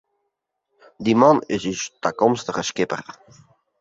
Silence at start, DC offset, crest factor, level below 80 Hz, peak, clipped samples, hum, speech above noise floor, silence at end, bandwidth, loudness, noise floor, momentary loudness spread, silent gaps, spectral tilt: 1 s; under 0.1%; 20 dB; -60 dBFS; -2 dBFS; under 0.1%; none; 57 dB; 0.7 s; 7.8 kHz; -21 LUFS; -77 dBFS; 12 LU; none; -5 dB/octave